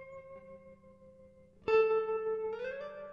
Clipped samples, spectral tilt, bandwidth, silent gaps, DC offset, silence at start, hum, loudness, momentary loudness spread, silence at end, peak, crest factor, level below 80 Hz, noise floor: under 0.1%; -5.5 dB/octave; 5.6 kHz; none; under 0.1%; 0 s; 50 Hz at -75 dBFS; -33 LUFS; 24 LU; 0 s; -18 dBFS; 16 dB; -72 dBFS; -59 dBFS